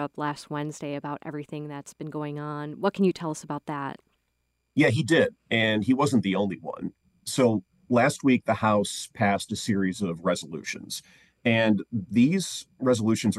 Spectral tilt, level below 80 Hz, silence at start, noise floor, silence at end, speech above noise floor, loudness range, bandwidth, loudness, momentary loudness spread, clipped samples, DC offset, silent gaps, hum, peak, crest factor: -5.5 dB/octave; -66 dBFS; 0 s; -75 dBFS; 0 s; 50 dB; 6 LU; 12.5 kHz; -26 LUFS; 13 LU; under 0.1%; under 0.1%; none; none; -10 dBFS; 18 dB